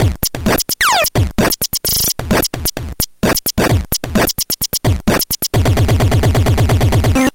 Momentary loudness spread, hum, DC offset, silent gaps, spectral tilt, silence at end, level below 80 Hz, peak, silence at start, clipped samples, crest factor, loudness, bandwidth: 4 LU; none; under 0.1%; none; -4 dB/octave; 0.05 s; -24 dBFS; -2 dBFS; 0 s; under 0.1%; 12 dB; -14 LUFS; 17 kHz